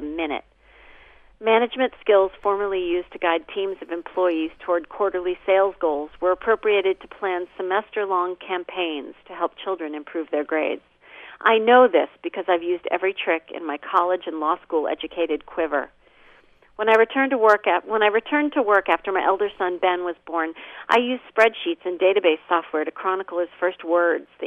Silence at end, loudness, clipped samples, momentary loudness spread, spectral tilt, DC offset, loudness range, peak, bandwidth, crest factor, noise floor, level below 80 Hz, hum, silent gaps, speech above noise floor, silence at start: 0 s; -22 LUFS; under 0.1%; 10 LU; -5 dB/octave; under 0.1%; 5 LU; -4 dBFS; 8 kHz; 20 dB; -53 dBFS; -60 dBFS; 60 Hz at -70 dBFS; none; 32 dB; 0 s